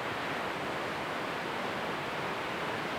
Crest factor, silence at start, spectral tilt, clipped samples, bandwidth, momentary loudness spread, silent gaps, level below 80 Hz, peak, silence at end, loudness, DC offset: 12 dB; 0 s; -4 dB/octave; under 0.1%; over 20 kHz; 1 LU; none; -64 dBFS; -22 dBFS; 0 s; -35 LUFS; under 0.1%